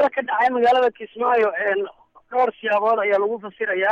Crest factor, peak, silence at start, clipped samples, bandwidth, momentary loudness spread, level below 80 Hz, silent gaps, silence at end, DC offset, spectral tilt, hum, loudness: 12 dB; -8 dBFS; 0 s; under 0.1%; 7.6 kHz; 8 LU; -68 dBFS; none; 0 s; under 0.1%; -5 dB/octave; none; -20 LUFS